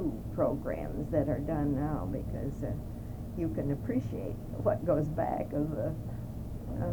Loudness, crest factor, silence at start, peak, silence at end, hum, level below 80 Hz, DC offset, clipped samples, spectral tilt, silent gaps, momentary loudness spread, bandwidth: -34 LUFS; 18 dB; 0 s; -14 dBFS; 0 s; none; -44 dBFS; under 0.1%; under 0.1%; -9.5 dB/octave; none; 9 LU; over 20 kHz